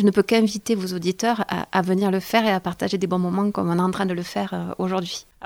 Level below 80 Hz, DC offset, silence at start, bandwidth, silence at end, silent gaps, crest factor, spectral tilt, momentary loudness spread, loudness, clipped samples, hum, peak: -58 dBFS; under 0.1%; 0 s; 17 kHz; 0 s; none; 18 dB; -5.5 dB/octave; 7 LU; -23 LUFS; under 0.1%; none; -4 dBFS